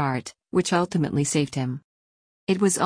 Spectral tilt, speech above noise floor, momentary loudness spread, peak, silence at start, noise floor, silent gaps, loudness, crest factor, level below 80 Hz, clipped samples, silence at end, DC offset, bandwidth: -5 dB/octave; over 66 dB; 9 LU; -8 dBFS; 0 s; under -90 dBFS; 1.84-2.47 s; -25 LUFS; 16 dB; -60 dBFS; under 0.1%; 0 s; under 0.1%; 10.5 kHz